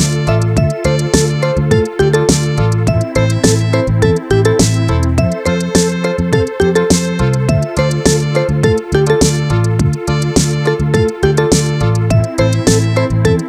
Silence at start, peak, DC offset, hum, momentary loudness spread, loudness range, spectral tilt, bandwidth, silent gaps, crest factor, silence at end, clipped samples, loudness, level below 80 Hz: 0 s; 0 dBFS; under 0.1%; none; 3 LU; 1 LU; -5.5 dB/octave; 14.5 kHz; none; 12 dB; 0 s; under 0.1%; -13 LUFS; -26 dBFS